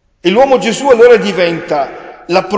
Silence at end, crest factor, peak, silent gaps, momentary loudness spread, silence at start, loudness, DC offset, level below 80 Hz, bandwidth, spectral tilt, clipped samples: 0 s; 10 dB; 0 dBFS; none; 11 LU; 0.25 s; -10 LUFS; under 0.1%; -48 dBFS; 8 kHz; -4.5 dB/octave; 0.3%